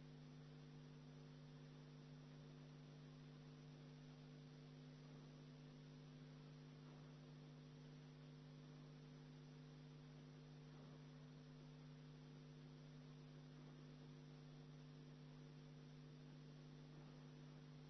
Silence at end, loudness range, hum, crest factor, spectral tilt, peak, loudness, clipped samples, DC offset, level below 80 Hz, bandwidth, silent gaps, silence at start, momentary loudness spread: 0 s; 0 LU; none; 10 dB; -6.5 dB/octave; -50 dBFS; -62 LUFS; under 0.1%; under 0.1%; -80 dBFS; 6.2 kHz; none; 0 s; 0 LU